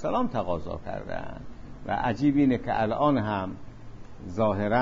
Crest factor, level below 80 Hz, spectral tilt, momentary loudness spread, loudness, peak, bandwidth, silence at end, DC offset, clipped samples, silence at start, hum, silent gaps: 16 dB; -46 dBFS; -8 dB/octave; 20 LU; -27 LUFS; -12 dBFS; 7.4 kHz; 0 s; under 0.1%; under 0.1%; 0 s; none; none